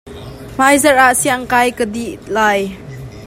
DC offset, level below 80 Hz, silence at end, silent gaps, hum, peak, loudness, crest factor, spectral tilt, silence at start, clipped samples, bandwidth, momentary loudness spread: under 0.1%; -42 dBFS; 0 s; none; none; 0 dBFS; -13 LUFS; 14 dB; -3 dB/octave; 0.05 s; under 0.1%; 16.5 kHz; 21 LU